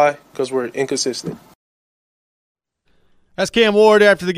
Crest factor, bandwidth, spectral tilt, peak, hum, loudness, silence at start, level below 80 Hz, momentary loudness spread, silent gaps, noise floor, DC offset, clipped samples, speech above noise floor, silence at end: 16 dB; 14.5 kHz; -3.5 dB/octave; -2 dBFS; none; -16 LUFS; 0 s; -58 dBFS; 17 LU; 1.55-2.55 s; -60 dBFS; under 0.1%; under 0.1%; 44 dB; 0 s